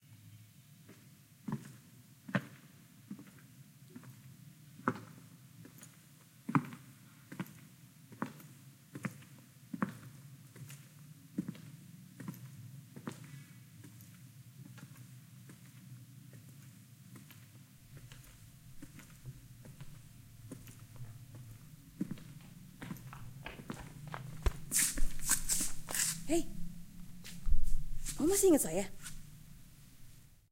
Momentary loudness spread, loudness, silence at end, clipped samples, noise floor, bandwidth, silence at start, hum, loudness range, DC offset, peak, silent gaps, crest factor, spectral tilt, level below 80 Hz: 24 LU; -38 LUFS; 0.4 s; under 0.1%; -60 dBFS; 16.5 kHz; 0.1 s; none; 20 LU; under 0.1%; -14 dBFS; none; 24 dB; -4 dB/octave; -44 dBFS